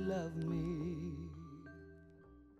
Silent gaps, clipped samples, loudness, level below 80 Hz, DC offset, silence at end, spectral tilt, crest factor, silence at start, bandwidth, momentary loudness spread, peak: none; under 0.1%; -42 LUFS; -58 dBFS; under 0.1%; 0 s; -8 dB/octave; 16 dB; 0 s; 7.8 kHz; 21 LU; -28 dBFS